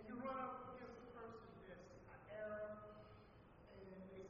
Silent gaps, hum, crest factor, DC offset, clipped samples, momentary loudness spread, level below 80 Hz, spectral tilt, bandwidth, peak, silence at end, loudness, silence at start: none; none; 18 dB; under 0.1%; under 0.1%; 15 LU; -74 dBFS; -5.5 dB/octave; 7 kHz; -36 dBFS; 0 s; -54 LUFS; 0 s